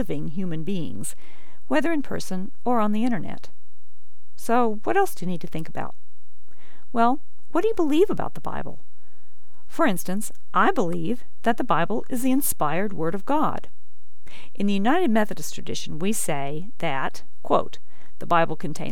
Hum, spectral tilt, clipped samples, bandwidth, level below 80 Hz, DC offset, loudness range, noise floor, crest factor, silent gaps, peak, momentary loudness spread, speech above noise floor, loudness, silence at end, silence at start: none; -5 dB/octave; under 0.1%; 19.5 kHz; -56 dBFS; 10%; 3 LU; -64 dBFS; 20 dB; none; -6 dBFS; 13 LU; 39 dB; -25 LUFS; 0 s; 0 s